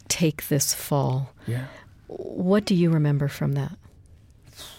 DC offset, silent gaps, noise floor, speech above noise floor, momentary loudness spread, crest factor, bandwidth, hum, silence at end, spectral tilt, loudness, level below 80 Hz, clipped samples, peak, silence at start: under 0.1%; none; -51 dBFS; 28 dB; 15 LU; 16 dB; 17 kHz; none; 0.05 s; -5.5 dB/octave; -24 LUFS; -54 dBFS; under 0.1%; -8 dBFS; 0.1 s